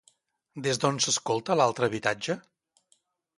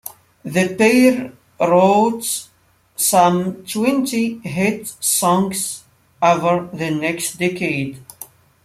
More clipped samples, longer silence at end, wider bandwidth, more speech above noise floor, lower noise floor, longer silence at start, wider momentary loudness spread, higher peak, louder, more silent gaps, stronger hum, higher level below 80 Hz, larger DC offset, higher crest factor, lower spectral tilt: neither; first, 1 s vs 0.4 s; second, 11.5 kHz vs 16 kHz; first, 43 dB vs 24 dB; first, -70 dBFS vs -41 dBFS; first, 0.55 s vs 0.05 s; second, 9 LU vs 20 LU; second, -8 dBFS vs -2 dBFS; second, -27 LUFS vs -17 LUFS; neither; neither; second, -70 dBFS vs -60 dBFS; neither; first, 22 dB vs 16 dB; second, -3 dB/octave vs -4.5 dB/octave